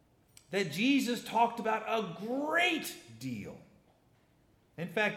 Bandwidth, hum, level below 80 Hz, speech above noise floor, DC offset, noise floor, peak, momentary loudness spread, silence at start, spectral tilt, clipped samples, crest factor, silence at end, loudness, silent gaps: 17 kHz; none; -76 dBFS; 35 dB; under 0.1%; -68 dBFS; -14 dBFS; 14 LU; 0.5 s; -4 dB/octave; under 0.1%; 20 dB; 0 s; -32 LUFS; none